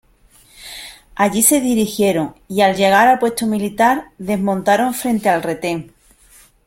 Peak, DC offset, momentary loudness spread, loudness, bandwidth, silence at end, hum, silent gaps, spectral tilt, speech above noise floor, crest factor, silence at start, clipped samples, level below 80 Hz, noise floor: 0 dBFS; under 0.1%; 14 LU; -16 LUFS; 16.5 kHz; 0.8 s; none; none; -4 dB/octave; 35 dB; 18 dB; 0.6 s; under 0.1%; -52 dBFS; -51 dBFS